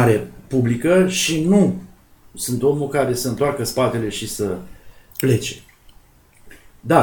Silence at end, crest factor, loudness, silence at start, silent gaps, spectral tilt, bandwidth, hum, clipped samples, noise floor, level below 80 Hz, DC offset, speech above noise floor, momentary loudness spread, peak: 0 s; 18 dB; -19 LUFS; 0 s; none; -5.5 dB/octave; 19.5 kHz; none; under 0.1%; -50 dBFS; -48 dBFS; under 0.1%; 32 dB; 13 LU; 0 dBFS